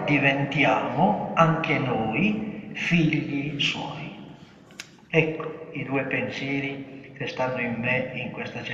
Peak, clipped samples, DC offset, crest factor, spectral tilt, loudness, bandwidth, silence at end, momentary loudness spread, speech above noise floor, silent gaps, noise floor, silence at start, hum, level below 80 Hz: -4 dBFS; under 0.1%; under 0.1%; 20 dB; -6 dB/octave; -25 LUFS; 7.8 kHz; 0 s; 16 LU; 23 dB; none; -47 dBFS; 0 s; none; -58 dBFS